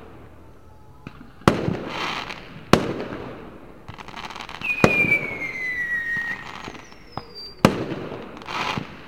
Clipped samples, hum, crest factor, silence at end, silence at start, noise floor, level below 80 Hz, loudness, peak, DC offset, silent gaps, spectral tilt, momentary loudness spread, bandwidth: under 0.1%; none; 26 dB; 0 s; 0 s; -48 dBFS; -48 dBFS; -23 LUFS; 0 dBFS; 0.4%; none; -5 dB/octave; 22 LU; 16.5 kHz